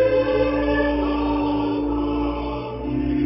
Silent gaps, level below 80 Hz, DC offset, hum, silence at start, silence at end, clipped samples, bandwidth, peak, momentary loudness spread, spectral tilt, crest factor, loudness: none; -34 dBFS; under 0.1%; none; 0 s; 0 s; under 0.1%; 5.8 kHz; -10 dBFS; 7 LU; -11.5 dB/octave; 12 dB; -22 LUFS